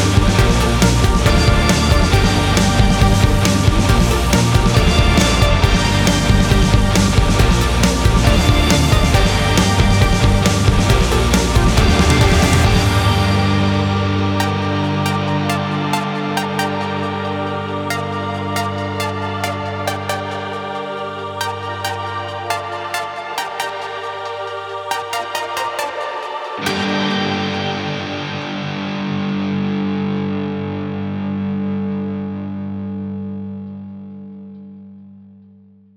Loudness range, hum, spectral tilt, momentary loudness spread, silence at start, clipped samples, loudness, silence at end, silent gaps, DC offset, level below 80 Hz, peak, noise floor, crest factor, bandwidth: 10 LU; none; -5 dB/octave; 12 LU; 0 s; under 0.1%; -17 LUFS; 0.75 s; none; under 0.1%; -22 dBFS; -2 dBFS; -46 dBFS; 14 dB; 19.5 kHz